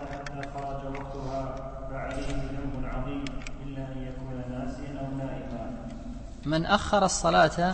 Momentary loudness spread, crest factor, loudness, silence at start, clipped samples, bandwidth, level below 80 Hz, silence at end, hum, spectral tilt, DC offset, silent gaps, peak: 15 LU; 22 dB; -31 LUFS; 0 s; under 0.1%; 8.8 kHz; -40 dBFS; 0 s; none; -4.5 dB/octave; under 0.1%; none; -8 dBFS